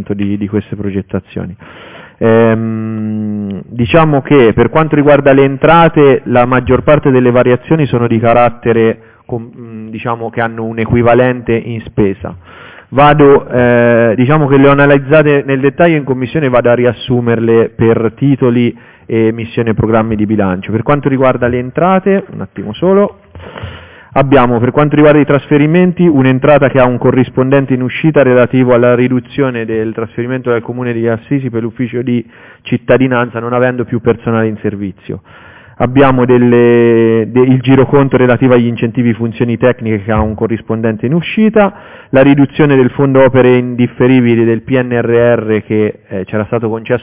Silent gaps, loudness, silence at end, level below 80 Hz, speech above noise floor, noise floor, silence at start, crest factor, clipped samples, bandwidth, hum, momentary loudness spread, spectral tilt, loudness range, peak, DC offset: none; -10 LUFS; 0 s; -36 dBFS; 21 dB; -30 dBFS; 0 s; 10 dB; 0.2%; 4 kHz; none; 11 LU; -11.5 dB/octave; 6 LU; 0 dBFS; under 0.1%